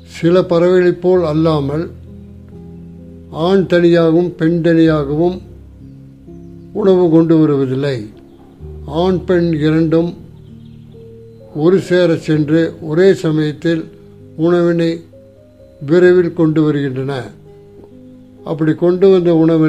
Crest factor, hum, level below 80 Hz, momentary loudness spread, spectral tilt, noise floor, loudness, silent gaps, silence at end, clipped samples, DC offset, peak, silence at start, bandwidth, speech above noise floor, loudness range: 14 dB; none; -42 dBFS; 19 LU; -8 dB/octave; -42 dBFS; -13 LUFS; none; 0 s; under 0.1%; 0.2%; 0 dBFS; 0.1 s; 8.8 kHz; 30 dB; 2 LU